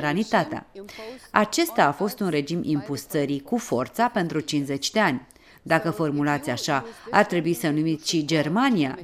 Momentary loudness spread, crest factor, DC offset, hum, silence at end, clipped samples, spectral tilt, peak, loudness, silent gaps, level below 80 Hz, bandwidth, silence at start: 6 LU; 24 dB; under 0.1%; none; 0 s; under 0.1%; -5 dB/octave; 0 dBFS; -24 LUFS; none; -60 dBFS; 16 kHz; 0 s